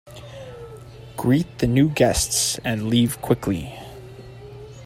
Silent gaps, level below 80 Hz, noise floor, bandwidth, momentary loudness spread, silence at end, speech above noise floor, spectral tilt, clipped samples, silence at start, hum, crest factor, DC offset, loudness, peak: none; -42 dBFS; -40 dBFS; 16 kHz; 22 LU; 0 s; 20 dB; -4.5 dB/octave; under 0.1%; 0.05 s; none; 20 dB; under 0.1%; -21 LUFS; -4 dBFS